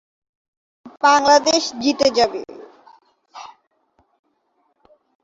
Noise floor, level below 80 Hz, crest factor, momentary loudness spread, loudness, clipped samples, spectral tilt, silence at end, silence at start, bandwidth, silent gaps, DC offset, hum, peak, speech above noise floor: -67 dBFS; -60 dBFS; 20 dB; 26 LU; -16 LUFS; under 0.1%; -1.5 dB/octave; 1.8 s; 0.85 s; 8 kHz; none; under 0.1%; none; -2 dBFS; 51 dB